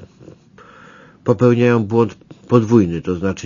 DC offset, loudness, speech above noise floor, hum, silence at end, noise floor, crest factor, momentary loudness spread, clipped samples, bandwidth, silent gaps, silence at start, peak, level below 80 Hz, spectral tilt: under 0.1%; -16 LUFS; 30 dB; none; 0 s; -44 dBFS; 18 dB; 8 LU; under 0.1%; 7.4 kHz; none; 0 s; 0 dBFS; -50 dBFS; -8 dB/octave